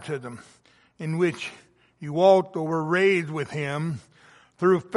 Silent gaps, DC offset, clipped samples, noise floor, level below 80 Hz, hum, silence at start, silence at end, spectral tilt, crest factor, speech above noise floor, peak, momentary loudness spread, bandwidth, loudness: none; under 0.1%; under 0.1%; -55 dBFS; -70 dBFS; none; 0 s; 0 s; -6.5 dB/octave; 20 dB; 31 dB; -6 dBFS; 18 LU; 11.5 kHz; -24 LUFS